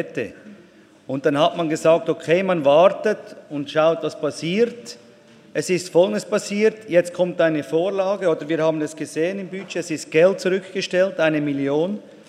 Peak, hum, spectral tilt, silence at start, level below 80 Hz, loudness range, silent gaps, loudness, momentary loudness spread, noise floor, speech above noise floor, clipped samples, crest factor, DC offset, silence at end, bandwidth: -2 dBFS; none; -5 dB/octave; 0 s; -72 dBFS; 3 LU; none; -21 LUFS; 11 LU; -49 dBFS; 29 dB; under 0.1%; 18 dB; under 0.1%; 0.15 s; 13.5 kHz